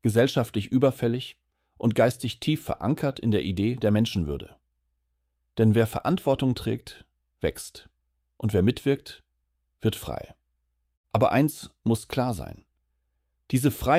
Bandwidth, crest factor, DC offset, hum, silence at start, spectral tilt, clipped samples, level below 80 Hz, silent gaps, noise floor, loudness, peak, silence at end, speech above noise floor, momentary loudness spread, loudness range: 16 kHz; 20 dB; under 0.1%; none; 0.05 s; -6.5 dB/octave; under 0.1%; -50 dBFS; 10.97-11.04 s; -76 dBFS; -26 LUFS; -8 dBFS; 0 s; 51 dB; 14 LU; 4 LU